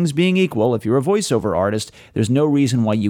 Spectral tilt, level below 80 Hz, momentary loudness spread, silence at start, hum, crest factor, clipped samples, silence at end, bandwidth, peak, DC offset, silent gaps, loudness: -6 dB/octave; -52 dBFS; 6 LU; 0 s; none; 12 dB; under 0.1%; 0 s; 16.5 kHz; -6 dBFS; under 0.1%; none; -18 LUFS